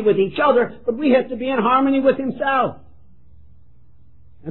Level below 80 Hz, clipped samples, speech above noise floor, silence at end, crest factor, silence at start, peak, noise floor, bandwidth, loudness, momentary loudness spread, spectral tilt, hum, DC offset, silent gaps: -54 dBFS; under 0.1%; 35 dB; 0 s; 16 dB; 0 s; -4 dBFS; -53 dBFS; 4.2 kHz; -18 LUFS; 7 LU; -10 dB/octave; 60 Hz at -45 dBFS; 0.9%; none